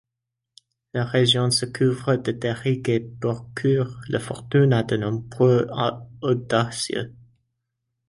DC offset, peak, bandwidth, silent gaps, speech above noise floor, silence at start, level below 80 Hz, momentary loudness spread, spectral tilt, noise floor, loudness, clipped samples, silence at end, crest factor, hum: under 0.1%; -6 dBFS; 11.5 kHz; none; 61 dB; 0.95 s; -56 dBFS; 10 LU; -5.5 dB/octave; -84 dBFS; -23 LUFS; under 0.1%; 0.95 s; 18 dB; none